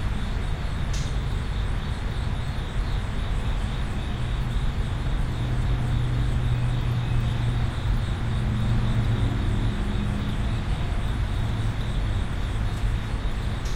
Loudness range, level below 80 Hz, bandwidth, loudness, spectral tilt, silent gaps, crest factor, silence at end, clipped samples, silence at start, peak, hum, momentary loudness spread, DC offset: 3 LU; -28 dBFS; 11.5 kHz; -28 LUFS; -6.5 dB/octave; none; 12 dB; 0 s; under 0.1%; 0 s; -12 dBFS; none; 5 LU; under 0.1%